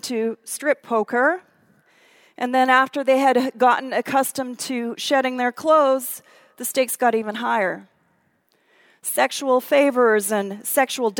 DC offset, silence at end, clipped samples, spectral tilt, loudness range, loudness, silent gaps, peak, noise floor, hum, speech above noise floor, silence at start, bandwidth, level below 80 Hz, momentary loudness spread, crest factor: under 0.1%; 0 s; under 0.1%; -2.5 dB/octave; 3 LU; -20 LUFS; none; -2 dBFS; -65 dBFS; none; 45 dB; 0.05 s; 19 kHz; -80 dBFS; 10 LU; 20 dB